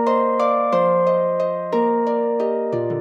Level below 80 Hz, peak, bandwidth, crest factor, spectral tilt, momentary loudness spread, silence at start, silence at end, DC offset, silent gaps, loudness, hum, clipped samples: -70 dBFS; -6 dBFS; 7.6 kHz; 12 dB; -8 dB/octave; 5 LU; 0 s; 0 s; under 0.1%; none; -19 LUFS; none; under 0.1%